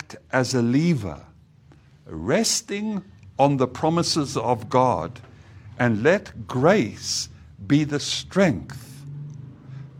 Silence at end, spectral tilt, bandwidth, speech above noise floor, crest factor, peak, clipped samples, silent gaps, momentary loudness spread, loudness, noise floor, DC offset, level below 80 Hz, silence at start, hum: 0 s; -5 dB/octave; 16.5 kHz; 30 dB; 20 dB; -4 dBFS; under 0.1%; none; 19 LU; -22 LUFS; -52 dBFS; under 0.1%; -54 dBFS; 0 s; none